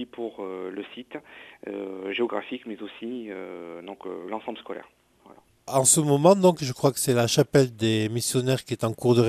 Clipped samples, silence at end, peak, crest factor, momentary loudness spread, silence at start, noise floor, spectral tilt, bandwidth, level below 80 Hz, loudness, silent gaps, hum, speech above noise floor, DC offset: under 0.1%; 0 s; -4 dBFS; 22 dB; 20 LU; 0 s; -54 dBFS; -4.5 dB/octave; 15.5 kHz; -64 dBFS; -24 LUFS; none; none; 29 dB; under 0.1%